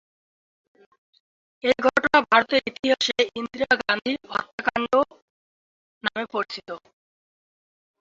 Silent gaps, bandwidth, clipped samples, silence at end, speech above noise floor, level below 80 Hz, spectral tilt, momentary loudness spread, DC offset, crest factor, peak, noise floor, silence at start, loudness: 2.79-2.83 s, 4.53-4.58 s, 5.22-6.01 s; 7.8 kHz; under 0.1%; 1.25 s; over 66 dB; -62 dBFS; -3 dB/octave; 11 LU; under 0.1%; 22 dB; -4 dBFS; under -90 dBFS; 1.65 s; -23 LUFS